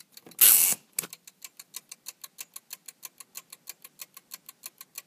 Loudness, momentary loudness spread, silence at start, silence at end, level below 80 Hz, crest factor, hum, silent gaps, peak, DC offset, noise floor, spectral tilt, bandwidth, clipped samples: -20 LUFS; 28 LU; 0.4 s; 4 s; under -90 dBFS; 30 dB; none; none; 0 dBFS; under 0.1%; -50 dBFS; 2 dB/octave; 15.5 kHz; under 0.1%